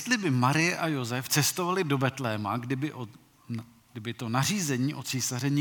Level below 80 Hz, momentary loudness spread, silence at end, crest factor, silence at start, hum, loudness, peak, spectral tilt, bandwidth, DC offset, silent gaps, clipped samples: -72 dBFS; 15 LU; 0 s; 20 dB; 0 s; none; -28 LUFS; -8 dBFS; -4 dB/octave; 19.5 kHz; under 0.1%; none; under 0.1%